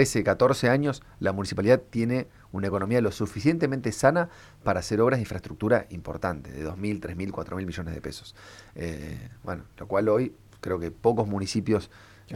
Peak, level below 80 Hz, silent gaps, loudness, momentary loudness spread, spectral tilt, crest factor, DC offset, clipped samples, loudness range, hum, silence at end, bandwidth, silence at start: -6 dBFS; -50 dBFS; none; -27 LUFS; 15 LU; -6 dB/octave; 20 dB; under 0.1%; under 0.1%; 9 LU; none; 0 s; 15.5 kHz; 0 s